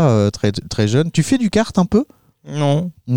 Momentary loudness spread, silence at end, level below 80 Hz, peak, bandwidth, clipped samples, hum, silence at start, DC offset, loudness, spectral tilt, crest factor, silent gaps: 5 LU; 0 s; -44 dBFS; -2 dBFS; 15.5 kHz; under 0.1%; none; 0 s; 0.8%; -17 LUFS; -6.5 dB/octave; 14 dB; none